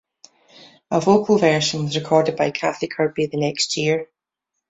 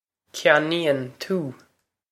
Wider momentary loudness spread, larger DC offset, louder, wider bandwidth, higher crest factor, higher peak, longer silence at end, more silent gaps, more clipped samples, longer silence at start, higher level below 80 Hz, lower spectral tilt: second, 8 LU vs 14 LU; neither; about the same, -20 LUFS vs -22 LUFS; second, 8.4 kHz vs 15.5 kHz; second, 18 dB vs 24 dB; about the same, -2 dBFS vs -2 dBFS; about the same, 0.65 s vs 0.6 s; neither; neither; first, 0.9 s vs 0.35 s; first, -62 dBFS vs -74 dBFS; about the same, -4.5 dB/octave vs -4.5 dB/octave